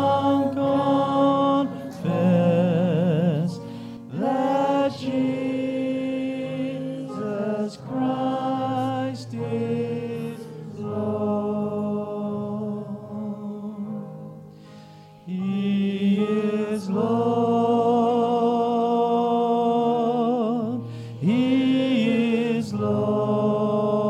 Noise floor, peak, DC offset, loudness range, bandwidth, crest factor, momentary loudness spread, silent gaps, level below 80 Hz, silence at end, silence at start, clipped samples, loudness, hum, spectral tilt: -46 dBFS; -8 dBFS; under 0.1%; 7 LU; 11.5 kHz; 14 dB; 12 LU; none; -66 dBFS; 0 s; 0 s; under 0.1%; -23 LUFS; none; -8 dB/octave